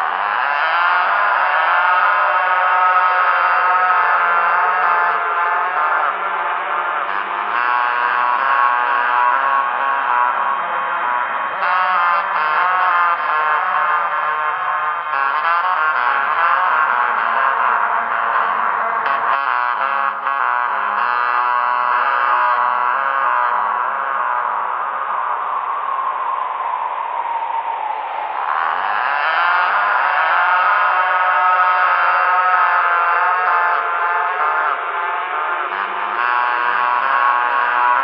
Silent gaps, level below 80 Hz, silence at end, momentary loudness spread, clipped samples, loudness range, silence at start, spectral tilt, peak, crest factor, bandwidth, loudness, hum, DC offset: none; -80 dBFS; 0 s; 7 LU; under 0.1%; 5 LU; 0 s; -4 dB/octave; -2 dBFS; 16 dB; 5.6 kHz; -16 LUFS; none; under 0.1%